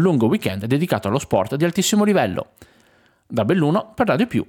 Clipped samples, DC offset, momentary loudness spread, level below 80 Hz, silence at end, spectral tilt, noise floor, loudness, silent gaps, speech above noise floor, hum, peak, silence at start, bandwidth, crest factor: under 0.1%; under 0.1%; 7 LU; -54 dBFS; 0.05 s; -5.5 dB/octave; -57 dBFS; -20 LUFS; none; 38 dB; none; -4 dBFS; 0 s; 18.5 kHz; 16 dB